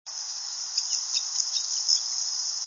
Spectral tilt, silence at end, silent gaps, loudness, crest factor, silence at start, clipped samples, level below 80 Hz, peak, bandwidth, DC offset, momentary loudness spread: 6.5 dB/octave; 0 s; none; -26 LUFS; 22 dB; 0.05 s; under 0.1%; under -90 dBFS; -8 dBFS; 7.4 kHz; under 0.1%; 8 LU